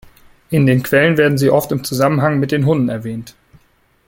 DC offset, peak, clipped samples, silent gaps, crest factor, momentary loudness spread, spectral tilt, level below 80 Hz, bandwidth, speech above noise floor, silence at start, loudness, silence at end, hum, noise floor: under 0.1%; -2 dBFS; under 0.1%; none; 14 dB; 8 LU; -6.5 dB/octave; -50 dBFS; 17 kHz; 41 dB; 0.5 s; -15 LUFS; 0.75 s; none; -56 dBFS